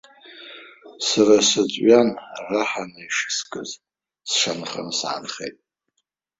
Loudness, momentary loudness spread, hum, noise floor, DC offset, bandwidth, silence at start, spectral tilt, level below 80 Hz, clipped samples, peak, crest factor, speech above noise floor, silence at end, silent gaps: -20 LUFS; 23 LU; none; -76 dBFS; under 0.1%; 8 kHz; 0.25 s; -2.5 dB/octave; -66 dBFS; under 0.1%; -2 dBFS; 20 dB; 55 dB; 0.9 s; none